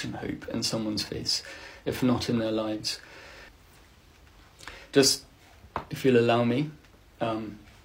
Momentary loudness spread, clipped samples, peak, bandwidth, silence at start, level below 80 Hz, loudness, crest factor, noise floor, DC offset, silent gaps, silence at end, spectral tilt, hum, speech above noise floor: 22 LU; under 0.1%; -6 dBFS; 16 kHz; 0 s; -56 dBFS; -27 LUFS; 22 dB; -55 dBFS; under 0.1%; none; 0.25 s; -4 dB/octave; none; 28 dB